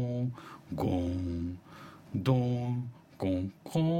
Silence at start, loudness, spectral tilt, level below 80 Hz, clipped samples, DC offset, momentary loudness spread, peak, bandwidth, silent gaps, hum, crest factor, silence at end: 0 s; -33 LUFS; -8.5 dB/octave; -54 dBFS; under 0.1%; under 0.1%; 16 LU; -14 dBFS; 15.5 kHz; none; none; 18 dB; 0 s